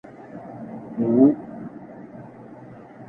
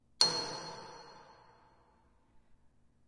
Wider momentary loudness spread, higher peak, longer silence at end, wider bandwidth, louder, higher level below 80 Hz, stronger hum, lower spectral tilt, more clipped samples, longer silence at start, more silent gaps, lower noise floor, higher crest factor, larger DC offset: about the same, 25 LU vs 24 LU; first, -4 dBFS vs -8 dBFS; second, 0.05 s vs 0.7 s; second, 2.6 kHz vs 11.5 kHz; first, -20 LUFS vs -32 LUFS; first, -64 dBFS vs -72 dBFS; neither; first, -11.5 dB/octave vs -1 dB/octave; neither; first, 0.35 s vs 0.2 s; neither; second, -42 dBFS vs -69 dBFS; second, 20 dB vs 32 dB; neither